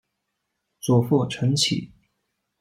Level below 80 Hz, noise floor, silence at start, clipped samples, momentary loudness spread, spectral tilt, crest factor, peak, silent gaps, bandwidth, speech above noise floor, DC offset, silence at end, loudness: -60 dBFS; -78 dBFS; 0.85 s; under 0.1%; 9 LU; -5 dB/octave; 18 dB; -8 dBFS; none; 16 kHz; 57 dB; under 0.1%; 0.75 s; -22 LUFS